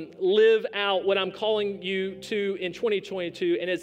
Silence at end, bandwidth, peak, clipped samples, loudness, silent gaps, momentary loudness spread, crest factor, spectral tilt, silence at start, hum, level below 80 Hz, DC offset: 0 s; 9.4 kHz; -12 dBFS; under 0.1%; -26 LUFS; none; 9 LU; 14 dB; -5 dB/octave; 0 s; none; -68 dBFS; under 0.1%